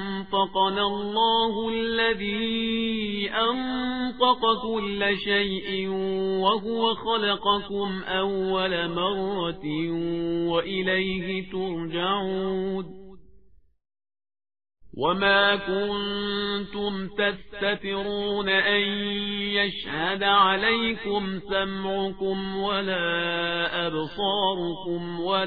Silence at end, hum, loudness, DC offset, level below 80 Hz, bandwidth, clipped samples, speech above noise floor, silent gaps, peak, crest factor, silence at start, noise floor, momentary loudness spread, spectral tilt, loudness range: 0 s; none; -25 LUFS; 0.5%; -52 dBFS; 5 kHz; under 0.1%; 31 dB; none; -6 dBFS; 20 dB; 0 s; -56 dBFS; 8 LU; -7.5 dB/octave; 4 LU